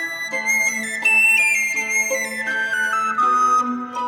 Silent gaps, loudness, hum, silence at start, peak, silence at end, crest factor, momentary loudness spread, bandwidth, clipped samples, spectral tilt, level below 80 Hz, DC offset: none; -17 LUFS; none; 0 s; -8 dBFS; 0 s; 12 dB; 9 LU; over 20 kHz; under 0.1%; -0.5 dB/octave; -76 dBFS; under 0.1%